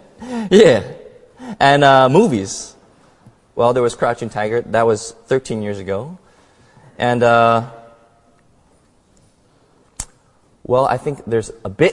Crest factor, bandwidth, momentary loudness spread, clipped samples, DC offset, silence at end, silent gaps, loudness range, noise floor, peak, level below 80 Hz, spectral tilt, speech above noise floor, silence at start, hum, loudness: 18 dB; 11.5 kHz; 21 LU; under 0.1%; under 0.1%; 0 s; none; 9 LU; -55 dBFS; 0 dBFS; -50 dBFS; -5.5 dB/octave; 40 dB; 0.2 s; none; -15 LUFS